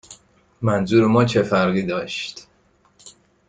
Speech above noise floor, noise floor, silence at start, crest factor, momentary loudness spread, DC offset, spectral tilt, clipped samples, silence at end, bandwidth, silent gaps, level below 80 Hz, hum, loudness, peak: 41 dB; -59 dBFS; 0.1 s; 18 dB; 12 LU; under 0.1%; -6.5 dB/octave; under 0.1%; 0.4 s; 9.4 kHz; none; -54 dBFS; none; -19 LUFS; -4 dBFS